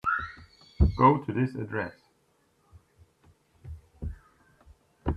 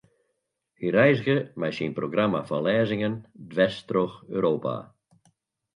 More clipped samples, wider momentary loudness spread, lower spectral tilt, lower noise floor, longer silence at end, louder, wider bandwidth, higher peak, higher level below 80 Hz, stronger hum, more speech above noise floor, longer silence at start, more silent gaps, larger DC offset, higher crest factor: neither; first, 25 LU vs 12 LU; first, -9 dB/octave vs -7.5 dB/octave; second, -69 dBFS vs -78 dBFS; second, 0 s vs 0.9 s; about the same, -27 LUFS vs -25 LUFS; second, 6 kHz vs 10.5 kHz; about the same, -8 dBFS vs -6 dBFS; first, -38 dBFS vs -64 dBFS; neither; second, 43 dB vs 54 dB; second, 0.05 s vs 0.8 s; neither; neither; about the same, 22 dB vs 20 dB